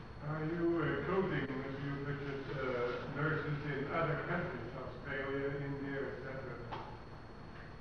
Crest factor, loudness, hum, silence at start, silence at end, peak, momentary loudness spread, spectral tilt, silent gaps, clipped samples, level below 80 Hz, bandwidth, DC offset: 16 dB; -39 LUFS; none; 0 s; 0 s; -24 dBFS; 11 LU; -8.5 dB/octave; none; under 0.1%; -58 dBFS; 6.6 kHz; 0.1%